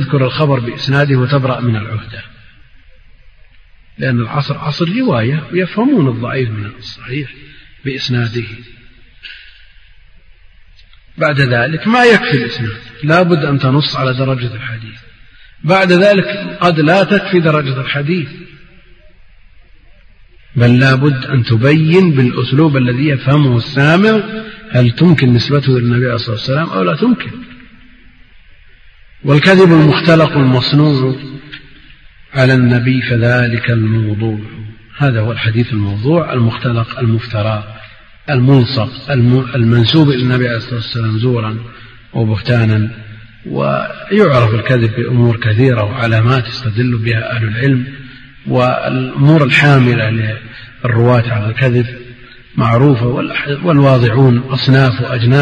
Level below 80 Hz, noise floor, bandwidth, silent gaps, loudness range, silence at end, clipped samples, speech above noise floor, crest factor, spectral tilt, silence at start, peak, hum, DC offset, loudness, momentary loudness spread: -42 dBFS; -41 dBFS; 8.2 kHz; none; 7 LU; 0 s; under 0.1%; 30 dB; 12 dB; -8 dB/octave; 0 s; 0 dBFS; none; under 0.1%; -12 LUFS; 14 LU